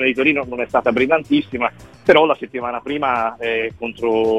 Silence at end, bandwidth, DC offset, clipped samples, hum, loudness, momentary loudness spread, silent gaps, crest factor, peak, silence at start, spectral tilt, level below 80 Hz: 0 s; 9.4 kHz; 0.1%; under 0.1%; none; -18 LUFS; 10 LU; none; 18 dB; 0 dBFS; 0 s; -6 dB/octave; -50 dBFS